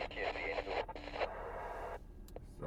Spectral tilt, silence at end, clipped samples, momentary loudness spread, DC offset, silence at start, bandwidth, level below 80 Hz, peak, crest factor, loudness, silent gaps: -5 dB/octave; 0 s; under 0.1%; 14 LU; under 0.1%; 0 s; 15.5 kHz; -54 dBFS; -24 dBFS; 18 dB; -42 LUFS; none